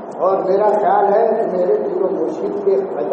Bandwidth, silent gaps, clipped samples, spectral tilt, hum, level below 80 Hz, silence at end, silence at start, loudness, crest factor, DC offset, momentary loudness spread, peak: 7.4 kHz; none; under 0.1%; -8 dB/octave; none; -68 dBFS; 0 s; 0 s; -16 LUFS; 12 dB; under 0.1%; 6 LU; -4 dBFS